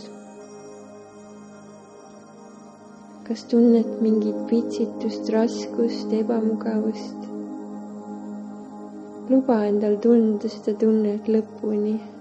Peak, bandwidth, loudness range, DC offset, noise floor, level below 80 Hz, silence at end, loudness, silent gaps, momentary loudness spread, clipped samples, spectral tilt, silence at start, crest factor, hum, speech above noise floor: -6 dBFS; 8.2 kHz; 6 LU; under 0.1%; -45 dBFS; -72 dBFS; 0 s; -22 LUFS; none; 24 LU; under 0.1%; -7.5 dB/octave; 0 s; 18 dB; none; 23 dB